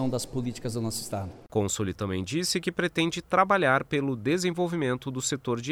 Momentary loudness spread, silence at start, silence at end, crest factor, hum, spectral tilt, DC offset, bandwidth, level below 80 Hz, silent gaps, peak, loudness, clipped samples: 9 LU; 0 s; 0 s; 20 dB; none; -4.5 dB/octave; under 0.1%; 18 kHz; -56 dBFS; none; -6 dBFS; -28 LUFS; under 0.1%